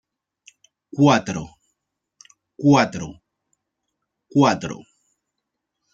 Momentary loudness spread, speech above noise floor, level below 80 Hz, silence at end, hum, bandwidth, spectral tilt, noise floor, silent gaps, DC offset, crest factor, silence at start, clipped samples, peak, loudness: 19 LU; 62 dB; -58 dBFS; 1.15 s; none; 7.8 kHz; -6 dB/octave; -80 dBFS; none; under 0.1%; 22 dB; 0.95 s; under 0.1%; -2 dBFS; -19 LUFS